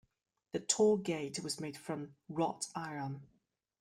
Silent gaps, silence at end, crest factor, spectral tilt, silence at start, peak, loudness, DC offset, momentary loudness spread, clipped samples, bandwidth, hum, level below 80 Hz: none; 0.55 s; 22 dB; -4 dB/octave; 0.55 s; -16 dBFS; -36 LUFS; under 0.1%; 14 LU; under 0.1%; 14.5 kHz; none; -76 dBFS